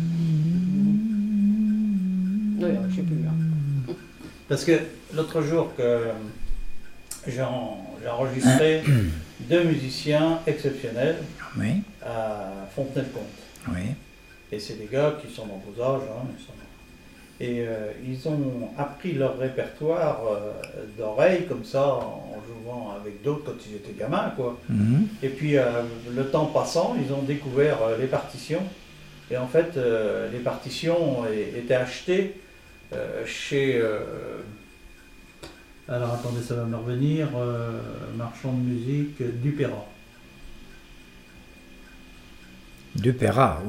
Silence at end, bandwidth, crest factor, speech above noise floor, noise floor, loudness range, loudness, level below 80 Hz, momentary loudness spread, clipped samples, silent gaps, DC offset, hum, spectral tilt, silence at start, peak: 0 s; 16 kHz; 20 dB; 23 dB; -49 dBFS; 7 LU; -26 LUFS; -48 dBFS; 15 LU; under 0.1%; none; under 0.1%; none; -7 dB/octave; 0 s; -6 dBFS